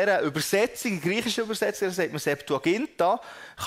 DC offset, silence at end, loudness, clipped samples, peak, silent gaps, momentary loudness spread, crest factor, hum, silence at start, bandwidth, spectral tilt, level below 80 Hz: under 0.1%; 0 s; -26 LUFS; under 0.1%; -10 dBFS; none; 4 LU; 16 dB; none; 0 s; 16 kHz; -4 dB/octave; -64 dBFS